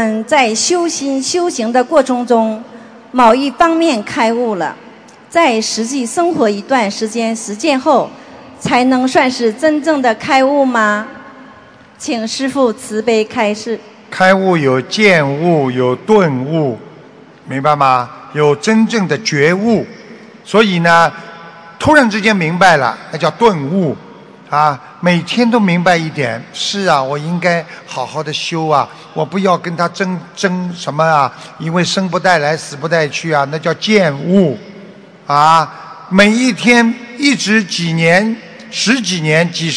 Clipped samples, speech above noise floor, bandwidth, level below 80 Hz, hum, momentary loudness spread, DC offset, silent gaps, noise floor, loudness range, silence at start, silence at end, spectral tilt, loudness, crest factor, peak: 0.5%; 27 dB; 11 kHz; -52 dBFS; none; 10 LU; under 0.1%; none; -40 dBFS; 4 LU; 0 s; 0 s; -4.5 dB/octave; -13 LUFS; 14 dB; 0 dBFS